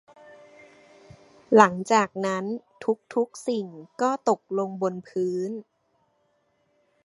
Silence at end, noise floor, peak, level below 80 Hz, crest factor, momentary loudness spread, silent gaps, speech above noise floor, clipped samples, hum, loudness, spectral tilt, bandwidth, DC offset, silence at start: 1.45 s; -69 dBFS; 0 dBFS; -72 dBFS; 26 dB; 13 LU; none; 45 dB; under 0.1%; none; -25 LUFS; -5.5 dB/octave; 11.5 kHz; under 0.1%; 1.5 s